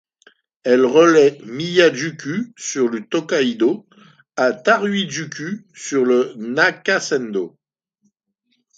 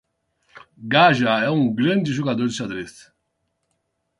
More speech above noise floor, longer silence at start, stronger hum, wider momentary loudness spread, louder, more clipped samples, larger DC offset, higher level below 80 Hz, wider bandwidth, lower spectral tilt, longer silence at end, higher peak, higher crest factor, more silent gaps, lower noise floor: about the same, 52 dB vs 54 dB; about the same, 0.65 s vs 0.55 s; neither; about the same, 14 LU vs 16 LU; about the same, -18 LUFS vs -19 LUFS; neither; neither; second, -68 dBFS vs -60 dBFS; second, 9 kHz vs 11.5 kHz; second, -4 dB/octave vs -5.5 dB/octave; about the same, 1.3 s vs 1.3 s; about the same, 0 dBFS vs -2 dBFS; about the same, 18 dB vs 20 dB; neither; second, -70 dBFS vs -74 dBFS